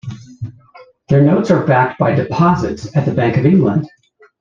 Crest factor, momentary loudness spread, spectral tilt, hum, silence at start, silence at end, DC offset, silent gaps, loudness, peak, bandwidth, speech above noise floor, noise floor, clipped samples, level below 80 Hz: 14 dB; 19 LU; -8.5 dB/octave; none; 0.05 s; 0.55 s; under 0.1%; none; -14 LUFS; -2 dBFS; 7.4 kHz; 30 dB; -44 dBFS; under 0.1%; -46 dBFS